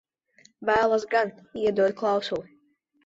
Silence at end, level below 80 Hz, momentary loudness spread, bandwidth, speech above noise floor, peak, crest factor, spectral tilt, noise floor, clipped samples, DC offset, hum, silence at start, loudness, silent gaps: 0.65 s; -62 dBFS; 10 LU; 7.8 kHz; 42 dB; -10 dBFS; 18 dB; -5 dB/octave; -66 dBFS; under 0.1%; under 0.1%; none; 0.6 s; -25 LUFS; none